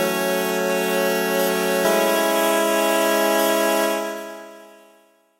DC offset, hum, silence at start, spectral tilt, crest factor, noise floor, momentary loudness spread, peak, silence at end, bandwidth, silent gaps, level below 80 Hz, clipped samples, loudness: under 0.1%; none; 0 s; -3 dB/octave; 16 dB; -56 dBFS; 7 LU; -4 dBFS; 0.75 s; 16 kHz; none; -70 dBFS; under 0.1%; -19 LUFS